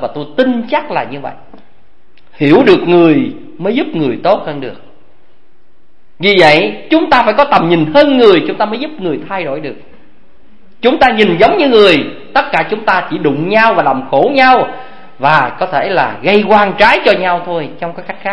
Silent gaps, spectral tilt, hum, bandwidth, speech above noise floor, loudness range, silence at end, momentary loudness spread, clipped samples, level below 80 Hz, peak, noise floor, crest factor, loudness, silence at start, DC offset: none; -6.5 dB/octave; none; 11 kHz; 44 dB; 4 LU; 0 s; 13 LU; 0.5%; -46 dBFS; 0 dBFS; -55 dBFS; 12 dB; -10 LUFS; 0 s; 3%